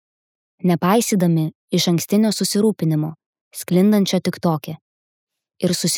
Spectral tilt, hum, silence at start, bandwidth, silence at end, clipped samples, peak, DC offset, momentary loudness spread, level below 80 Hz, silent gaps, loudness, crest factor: -5.5 dB/octave; none; 0.65 s; 18.5 kHz; 0 s; under 0.1%; -4 dBFS; under 0.1%; 11 LU; -68 dBFS; 1.55-1.68 s, 3.26-3.33 s, 3.41-3.51 s, 4.81-5.27 s; -19 LUFS; 16 dB